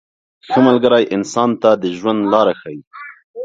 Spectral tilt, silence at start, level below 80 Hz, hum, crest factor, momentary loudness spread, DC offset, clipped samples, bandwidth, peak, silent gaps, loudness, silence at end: -5.5 dB/octave; 0.5 s; -60 dBFS; none; 16 dB; 20 LU; under 0.1%; under 0.1%; 7.8 kHz; 0 dBFS; 2.87-2.91 s, 3.24-3.34 s; -14 LUFS; 0 s